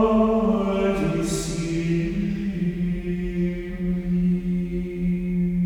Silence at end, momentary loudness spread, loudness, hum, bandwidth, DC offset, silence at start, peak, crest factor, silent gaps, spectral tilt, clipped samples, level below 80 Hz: 0 s; 6 LU; -24 LUFS; none; 12.5 kHz; under 0.1%; 0 s; -8 dBFS; 16 dB; none; -7 dB/octave; under 0.1%; -36 dBFS